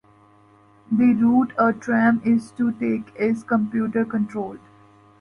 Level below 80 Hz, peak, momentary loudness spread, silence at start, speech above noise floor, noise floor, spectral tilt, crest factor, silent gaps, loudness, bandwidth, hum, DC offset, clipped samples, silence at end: -62 dBFS; -6 dBFS; 8 LU; 0.9 s; 33 dB; -54 dBFS; -8 dB/octave; 16 dB; none; -21 LUFS; 10.5 kHz; none; under 0.1%; under 0.1%; 0.65 s